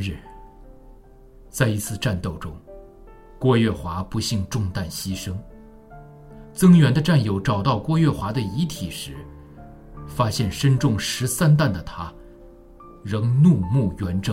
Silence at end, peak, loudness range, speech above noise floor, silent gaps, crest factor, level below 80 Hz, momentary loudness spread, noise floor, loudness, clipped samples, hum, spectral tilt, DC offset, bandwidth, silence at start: 0 s; -4 dBFS; 5 LU; 26 dB; none; 18 dB; -44 dBFS; 19 LU; -47 dBFS; -21 LUFS; under 0.1%; none; -6 dB/octave; under 0.1%; 16 kHz; 0 s